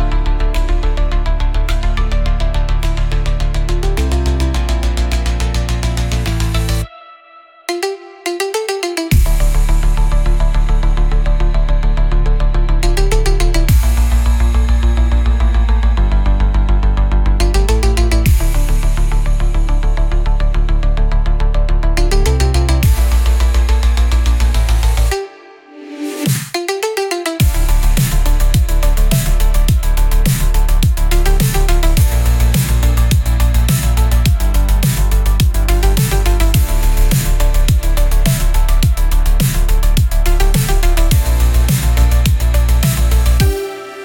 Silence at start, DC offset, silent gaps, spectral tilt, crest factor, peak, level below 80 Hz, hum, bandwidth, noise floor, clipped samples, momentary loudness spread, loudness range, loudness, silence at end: 0 s; under 0.1%; none; -5 dB/octave; 10 dB; -2 dBFS; -12 dBFS; none; 17.5 kHz; -42 dBFS; under 0.1%; 5 LU; 4 LU; -15 LUFS; 0 s